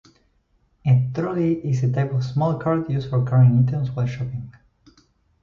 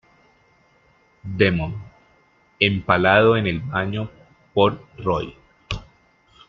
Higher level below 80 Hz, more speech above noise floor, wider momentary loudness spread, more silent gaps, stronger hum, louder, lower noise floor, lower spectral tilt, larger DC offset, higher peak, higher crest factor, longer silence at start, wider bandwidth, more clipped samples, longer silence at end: second, -52 dBFS vs -46 dBFS; first, 43 dB vs 39 dB; second, 12 LU vs 18 LU; neither; neither; about the same, -21 LUFS vs -21 LUFS; first, -64 dBFS vs -58 dBFS; first, -9.5 dB/octave vs -7 dB/octave; neither; second, -6 dBFS vs -2 dBFS; second, 14 dB vs 22 dB; second, 0.85 s vs 1.25 s; about the same, 6.8 kHz vs 7.4 kHz; neither; first, 0.9 s vs 0.7 s